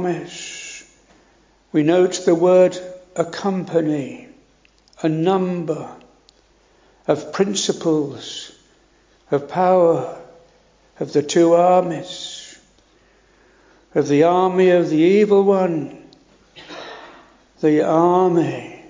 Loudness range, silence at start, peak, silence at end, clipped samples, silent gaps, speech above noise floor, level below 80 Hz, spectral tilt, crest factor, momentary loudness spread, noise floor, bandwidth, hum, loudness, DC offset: 7 LU; 0 s; -2 dBFS; 0.1 s; under 0.1%; none; 39 dB; -62 dBFS; -6 dB/octave; 18 dB; 19 LU; -56 dBFS; 7.6 kHz; none; -18 LUFS; under 0.1%